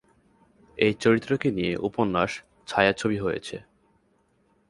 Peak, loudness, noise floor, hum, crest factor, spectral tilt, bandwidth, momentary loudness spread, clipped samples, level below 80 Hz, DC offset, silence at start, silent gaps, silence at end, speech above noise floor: -4 dBFS; -25 LUFS; -66 dBFS; none; 22 dB; -5.5 dB/octave; 11.5 kHz; 15 LU; under 0.1%; -56 dBFS; under 0.1%; 0.75 s; none; 1.1 s; 42 dB